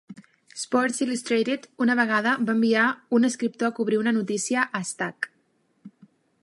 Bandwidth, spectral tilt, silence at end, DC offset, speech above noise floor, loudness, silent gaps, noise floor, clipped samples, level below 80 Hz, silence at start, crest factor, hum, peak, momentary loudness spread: 11.5 kHz; -4 dB/octave; 0.55 s; under 0.1%; 44 dB; -24 LUFS; none; -68 dBFS; under 0.1%; -78 dBFS; 0.1 s; 18 dB; none; -8 dBFS; 9 LU